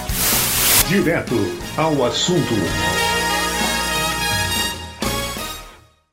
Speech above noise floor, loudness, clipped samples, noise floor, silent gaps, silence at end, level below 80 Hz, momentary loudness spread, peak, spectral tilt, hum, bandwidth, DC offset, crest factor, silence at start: 25 dB; -18 LUFS; under 0.1%; -44 dBFS; none; 0.35 s; -36 dBFS; 10 LU; -2 dBFS; -3 dB/octave; none; 16.5 kHz; under 0.1%; 18 dB; 0 s